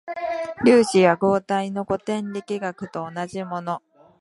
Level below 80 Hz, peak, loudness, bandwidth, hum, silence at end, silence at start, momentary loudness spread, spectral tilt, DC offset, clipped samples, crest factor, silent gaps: -60 dBFS; -4 dBFS; -22 LUFS; 11.5 kHz; none; 0.45 s; 0.05 s; 14 LU; -5.5 dB/octave; under 0.1%; under 0.1%; 20 dB; none